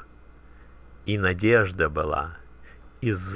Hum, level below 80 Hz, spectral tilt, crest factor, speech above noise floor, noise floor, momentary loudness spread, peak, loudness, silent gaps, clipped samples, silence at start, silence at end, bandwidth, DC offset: none; -42 dBFS; -10.5 dB/octave; 20 dB; 26 dB; -50 dBFS; 12 LU; -8 dBFS; -24 LUFS; none; under 0.1%; 0 s; 0 s; 4 kHz; 0.2%